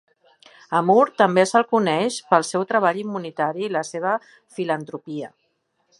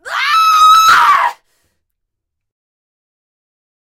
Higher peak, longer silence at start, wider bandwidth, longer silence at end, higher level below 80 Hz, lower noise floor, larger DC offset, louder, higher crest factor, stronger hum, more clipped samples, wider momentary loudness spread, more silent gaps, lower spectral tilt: about the same, -2 dBFS vs 0 dBFS; first, 0.7 s vs 0.05 s; second, 11.5 kHz vs 16 kHz; second, 0.75 s vs 2.65 s; second, -76 dBFS vs -56 dBFS; second, -70 dBFS vs -75 dBFS; neither; second, -21 LUFS vs -8 LUFS; first, 20 dB vs 12 dB; neither; neither; first, 15 LU vs 7 LU; neither; first, -5 dB/octave vs 1.5 dB/octave